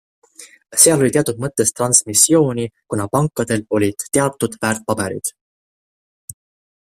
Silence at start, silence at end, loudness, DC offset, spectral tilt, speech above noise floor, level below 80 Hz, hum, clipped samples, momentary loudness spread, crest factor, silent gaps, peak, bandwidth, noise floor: 0.4 s; 0.55 s; -16 LUFS; under 0.1%; -3.5 dB/octave; over 73 dB; -54 dBFS; none; under 0.1%; 12 LU; 18 dB; 5.41-6.28 s; 0 dBFS; 16 kHz; under -90 dBFS